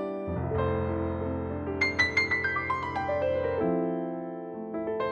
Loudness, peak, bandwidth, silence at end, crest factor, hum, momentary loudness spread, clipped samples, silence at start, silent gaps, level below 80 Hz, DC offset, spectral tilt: -29 LUFS; -12 dBFS; 9 kHz; 0 s; 16 dB; none; 10 LU; under 0.1%; 0 s; none; -48 dBFS; under 0.1%; -6.5 dB/octave